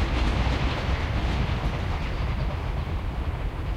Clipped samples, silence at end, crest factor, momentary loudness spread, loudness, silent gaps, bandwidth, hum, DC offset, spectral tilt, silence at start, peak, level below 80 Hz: under 0.1%; 0 s; 14 dB; 5 LU; -28 LUFS; none; 10 kHz; none; under 0.1%; -6.5 dB/octave; 0 s; -12 dBFS; -28 dBFS